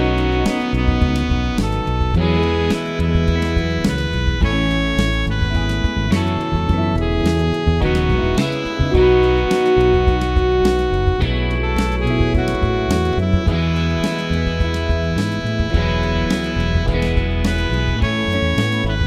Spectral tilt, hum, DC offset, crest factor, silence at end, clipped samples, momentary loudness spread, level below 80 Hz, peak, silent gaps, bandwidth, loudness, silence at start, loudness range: -6.5 dB/octave; none; under 0.1%; 14 dB; 0 s; under 0.1%; 4 LU; -22 dBFS; -2 dBFS; none; 13.5 kHz; -18 LUFS; 0 s; 3 LU